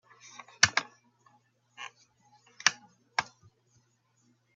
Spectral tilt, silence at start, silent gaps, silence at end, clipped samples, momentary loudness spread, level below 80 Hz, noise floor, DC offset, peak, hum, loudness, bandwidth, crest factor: 1 dB/octave; 0.6 s; none; 1.35 s; under 0.1%; 25 LU; -70 dBFS; -71 dBFS; under 0.1%; 0 dBFS; none; -28 LUFS; 8 kHz; 36 dB